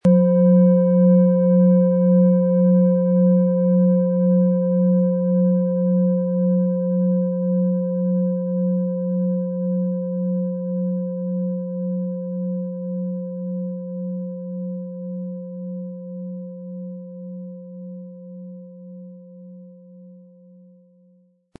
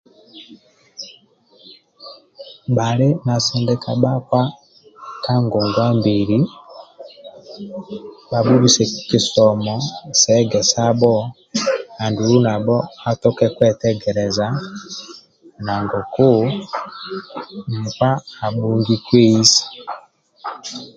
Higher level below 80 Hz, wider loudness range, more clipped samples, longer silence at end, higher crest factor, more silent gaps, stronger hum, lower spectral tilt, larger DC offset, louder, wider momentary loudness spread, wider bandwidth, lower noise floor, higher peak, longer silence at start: second, -68 dBFS vs -52 dBFS; first, 19 LU vs 5 LU; neither; first, 1.45 s vs 0.1 s; about the same, 14 dB vs 18 dB; neither; neither; first, -13.5 dB/octave vs -5 dB/octave; neither; about the same, -19 LUFS vs -17 LUFS; about the same, 19 LU vs 19 LU; second, 1.7 kHz vs 9.2 kHz; first, -58 dBFS vs -52 dBFS; second, -6 dBFS vs 0 dBFS; second, 0.05 s vs 0.35 s